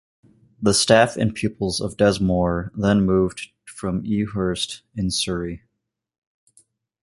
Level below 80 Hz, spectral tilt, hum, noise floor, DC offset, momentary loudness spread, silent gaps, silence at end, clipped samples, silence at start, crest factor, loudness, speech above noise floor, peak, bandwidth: -42 dBFS; -4.5 dB/octave; none; -79 dBFS; under 0.1%; 12 LU; none; 1.45 s; under 0.1%; 0.6 s; 20 dB; -21 LUFS; 58 dB; -2 dBFS; 11.5 kHz